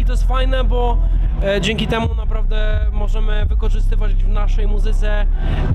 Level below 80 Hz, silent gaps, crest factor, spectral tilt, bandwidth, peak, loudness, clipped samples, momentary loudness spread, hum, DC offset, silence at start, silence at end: -14 dBFS; none; 10 dB; -6.5 dB/octave; 8.2 kHz; -4 dBFS; -20 LUFS; under 0.1%; 3 LU; none; under 0.1%; 0 s; 0 s